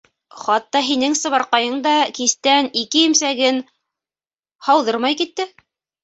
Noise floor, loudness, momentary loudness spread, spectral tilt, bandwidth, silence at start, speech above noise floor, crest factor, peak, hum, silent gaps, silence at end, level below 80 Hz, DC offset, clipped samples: under -90 dBFS; -17 LUFS; 9 LU; -0.5 dB/octave; 8.2 kHz; 0.35 s; over 72 dB; 18 dB; -2 dBFS; none; none; 0.55 s; -68 dBFS; under 0.1%; under 0.1%